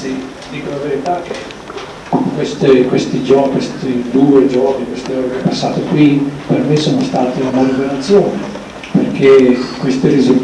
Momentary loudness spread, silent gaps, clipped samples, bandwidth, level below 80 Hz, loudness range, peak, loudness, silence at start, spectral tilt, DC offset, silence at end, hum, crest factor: 15 LU; none; under 0.1%; 11 kHz; -46 dBFS; 2 LU; -2 dBFS; -13 LUFS; 0 s; -6.5 dB/octave; under 0.1%; 0 s; none; 12 dB